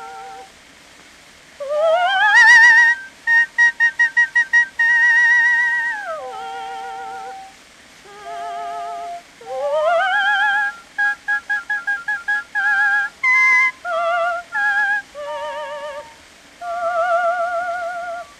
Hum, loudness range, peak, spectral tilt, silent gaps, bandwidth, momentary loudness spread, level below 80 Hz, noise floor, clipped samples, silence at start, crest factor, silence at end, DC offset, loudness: none; 12 LU; -2 dBFS; 0.5 dB/octave; none; 13 kHz; 19 LU; -64 dBFS; -45 dBFS; under 0.1%; 0 s; 16 dB; 0.15 s; under 0.1%; -15 LUFS